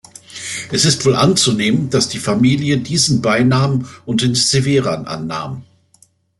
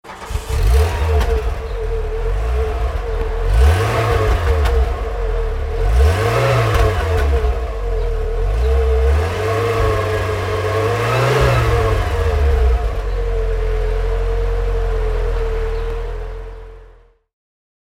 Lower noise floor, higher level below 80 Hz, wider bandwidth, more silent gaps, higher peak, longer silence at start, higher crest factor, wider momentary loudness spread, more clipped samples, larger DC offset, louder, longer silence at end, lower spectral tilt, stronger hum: first, -54 dBFS vs -46 dBFS; second, -50 dBFS vs -18 dBFS; second, 12 kHz vs 15.5 kHz; neither; about the same, 0 dBFS vs -2 dBFS; first, 0.3 s vs 0.05 s; about the same, 16 dB vs 14 dB; first, 12 LU vs 8 LU; neither; neither; first, -15 LUFS vs -18 LUFS; second, 0.75 s vs 0.95 s; second, -4.5 dB/octave vs -6 dB/octave; neither